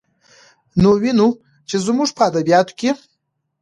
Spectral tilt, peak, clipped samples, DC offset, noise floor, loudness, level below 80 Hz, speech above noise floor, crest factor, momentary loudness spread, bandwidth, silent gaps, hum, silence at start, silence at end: -5.5 dB/octave; -2 dBFS; under 0.1%; under 0.1%; -72 dBFS; -17 LUFS; -46 dBFS; 56 dB; 16 dB; 10 LU; 11.5 kHz; none; none; 0.75 s; 0.65 s